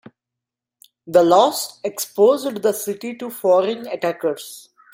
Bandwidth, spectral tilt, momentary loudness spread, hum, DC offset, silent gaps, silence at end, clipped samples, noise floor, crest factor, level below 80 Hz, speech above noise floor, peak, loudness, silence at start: 16.5 kHz; -4 dB/octave; 14 LU; none; under 0.1%; none; 0.35 s; under 0.1%; -85 dBFS; 18 dB; -68 dBFS; 67 dB; -2 dBFS; -19 LUFS; 1.05 s